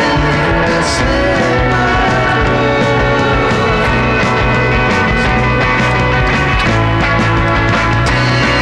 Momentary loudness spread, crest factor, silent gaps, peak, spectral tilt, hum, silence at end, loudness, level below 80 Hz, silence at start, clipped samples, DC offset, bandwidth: 1 LU; 8 dB; none; -4 dBFS; -5.5 dB/octave; none; 0 s; -12 LUFS; -22 dBFS; 0 s; under 0.1%; 0.4%; 10.5 kHz